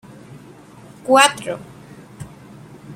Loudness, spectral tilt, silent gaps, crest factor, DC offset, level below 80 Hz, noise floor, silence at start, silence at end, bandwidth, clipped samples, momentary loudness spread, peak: -15 LUFS; -2.5 dB/octave; none; 22 dB; under 0.1%; -58 dBFS; -43 dBFS; 0.35 s; 0 s; 16.5 kHz; under 0.1%; 27 LU; 0 dBFS